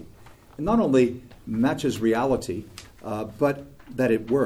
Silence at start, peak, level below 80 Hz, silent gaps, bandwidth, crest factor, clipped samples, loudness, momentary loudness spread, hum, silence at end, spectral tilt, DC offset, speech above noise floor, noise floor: 0 s; -8 dBFS; -50 dBFS; none; 15.5 kHz; 16 dB; under 0.1%; -25 LUFS; 15 LU; none; 0 s; -6.5 dB/octave; under 0.1%; 25 dB; -48 dBFS